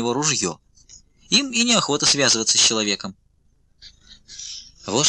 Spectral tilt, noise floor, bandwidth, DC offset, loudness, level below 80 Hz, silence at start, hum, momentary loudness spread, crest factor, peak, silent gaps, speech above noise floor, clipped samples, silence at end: -1.5 dB/octave; -60 dBFS; 11 kHz; under 0.1%; -18 LUFS; -56 dBFS; 0 s; none; 19 LU; 18 dB; -4 dBFS; none; 40 dB; under 0.1%; 0 s